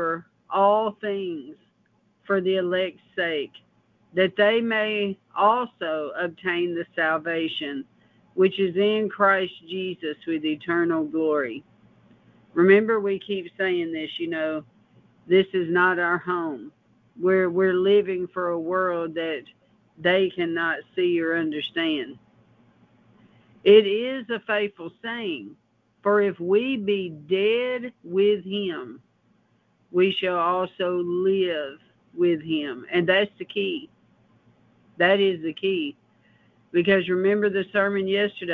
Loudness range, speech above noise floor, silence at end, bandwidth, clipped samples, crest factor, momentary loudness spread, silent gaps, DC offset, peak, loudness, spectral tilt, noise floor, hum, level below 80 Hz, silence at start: 3 LU; 42 dB; 0 s; 4.5 kHz; under 0.1%; 20 dB; 11 LU; none; under 0.1%; -4 dBFS; -24 LUFS; -8 dB/octave; -65 dBFS; none; -68 dBFS; 0 s